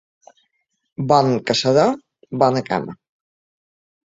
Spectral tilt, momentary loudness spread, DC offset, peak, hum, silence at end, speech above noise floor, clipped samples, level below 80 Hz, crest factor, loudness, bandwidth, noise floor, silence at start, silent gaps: -5.5 dB/octave; 16 LU; under 0.1%; -2 dBFS; none; 1.1 s; 54 dB; under 0.1%; -58 dBFS; 20 dB; -18 LUFS; 7.8 kHz; -71 dBFS; 1 s; none